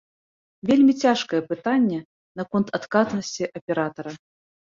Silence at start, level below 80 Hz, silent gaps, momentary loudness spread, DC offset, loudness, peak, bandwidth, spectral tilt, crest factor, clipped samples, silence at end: 0.65 s; -64 dBFS; 2.05-2.35 s, 3.61-3.67 s; 16 LU; under 0.1%; -23 LUFS; -6 dBFS; 7.6 kHz; -5.5 dB/octave; 18 dB; under 0.1%; 0.5 s